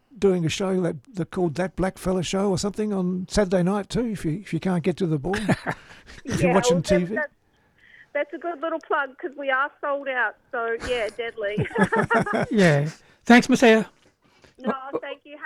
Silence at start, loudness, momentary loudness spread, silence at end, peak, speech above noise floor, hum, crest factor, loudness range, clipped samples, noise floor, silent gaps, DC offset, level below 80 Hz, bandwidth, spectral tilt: 0.15 s; -23 LUFS; 12 LU; 0 s; -4 dBFS; 37 dB; none; 20 dB; 6 LU; under 0.1%; -60 dBFS; none; under 0.1%; -48 dBFS; 14 kHz; -5.5 dB/octave